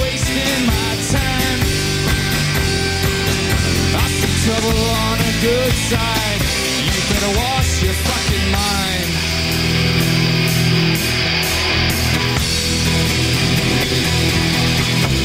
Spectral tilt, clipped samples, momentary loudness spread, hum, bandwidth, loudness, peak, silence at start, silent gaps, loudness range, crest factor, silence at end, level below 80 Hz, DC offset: -4 dB/octave; under 0.1%; 2 LU; none; 16 kHz; -16 LUFS; -2 dBFS; 0 s; none; 1 LU; 14 dB; 0 s; -26 dBFS; under 0.1%